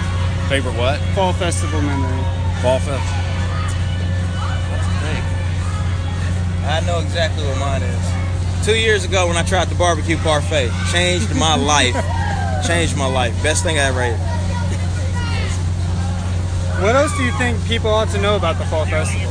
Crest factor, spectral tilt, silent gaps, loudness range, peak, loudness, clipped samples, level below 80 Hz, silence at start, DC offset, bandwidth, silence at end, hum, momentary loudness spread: 18 dB; -5 dB/octave; none; 4 LU; 0 dBFS; -18 LUFS; under 0.1%; -28 dBFS; 0 s; under 0.1%; 10.5 kHz; 0 s; none; 5 LU